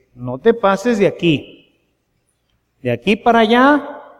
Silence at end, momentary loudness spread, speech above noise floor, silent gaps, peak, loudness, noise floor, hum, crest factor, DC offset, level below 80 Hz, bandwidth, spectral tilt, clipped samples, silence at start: 0.2 s; 11 LU; 52 dB; none; -2 dBFS; -15 LUFS; -66 dBFS; none; 16 dB; under 0.1%; -50 dBFS; 13 kHz; -6 dB/octave; under 0.1%; 0.2 s